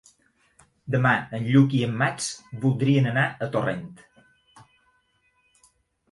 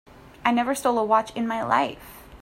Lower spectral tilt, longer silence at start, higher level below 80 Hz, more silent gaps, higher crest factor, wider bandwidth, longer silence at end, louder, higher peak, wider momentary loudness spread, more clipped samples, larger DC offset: first, -6 dB/octave vs -4 dB/octave; first, 0.85 s vs 0.45 s; second, -62 dBFS vs -54 dBFS; neither; about the same, 20 dB vs 20 dB; second, 11.5 kHz vs 16 kHz; first, 2.2 s vs 0.05 s; about the same, -23 LUFS vs -24 LUFS; about the same, -6 dBFS vs -4 dBFS; about the same, 11 LU vs 9 LU; neither; neither